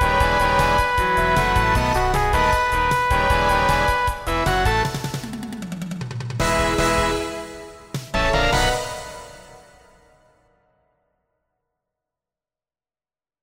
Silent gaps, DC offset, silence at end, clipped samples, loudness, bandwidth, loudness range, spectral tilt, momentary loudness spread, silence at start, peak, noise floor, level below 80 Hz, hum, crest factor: none; under 0.1%; 3.85 s; under 0.1%; -20 LUFS; 16 kHz; 7 LU; -4.5 dB/octave; 13 LU; 0 s; -4 dBFS; under -90 dBFS; -30 dBFS; none; 18 dB